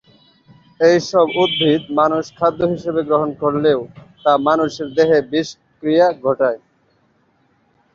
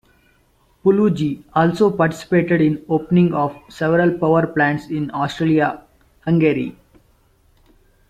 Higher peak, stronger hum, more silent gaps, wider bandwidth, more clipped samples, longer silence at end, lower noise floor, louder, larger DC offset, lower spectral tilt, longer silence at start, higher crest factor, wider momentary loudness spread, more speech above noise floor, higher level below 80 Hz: first, 0 dBFS vs -4 dBFS; neither; neither; second, 7.4 kHz vs 9.4 kHz; neither; about the same, 1.4 s vs 1.4 s; about the same, -60 dBFS vs -58 dBFS; about the same, -17 LUFS vs -18 LUFS; neither; second, -5.5 dB/octave vs -8 dB/octave; about the same, 0.8 s vs 0.85 s; about the same, 16 dB vs 16 dB; about the same, 7 LU vs 8 LU; about the same, 44 dB vs 41 dB; about the same, -56 dBFS vs -52 dBFS